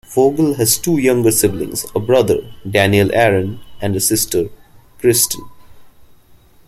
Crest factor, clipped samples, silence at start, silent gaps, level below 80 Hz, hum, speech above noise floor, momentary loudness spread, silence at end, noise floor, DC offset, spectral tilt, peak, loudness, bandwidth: 16 dB; under 0.1%; 0.1 s; none; -44 dBFS; none; 33 dB; 9 LU; 0.8 s; -47 dBFS; under 0.1%; -4 dB/octave; 0 dBFS; -15 LUFS; 16.5 kHz